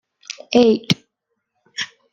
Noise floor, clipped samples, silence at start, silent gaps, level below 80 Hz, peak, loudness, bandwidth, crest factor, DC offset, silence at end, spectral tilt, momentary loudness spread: -76 dBFS; under 0.1%; 0.3 s; none; -60 dBFS; 0 dBFS; -18 LUFS; 12.5 kHz; 20 dB; under 0.1%; 0.25 s; -5 dB/octave; 19 LU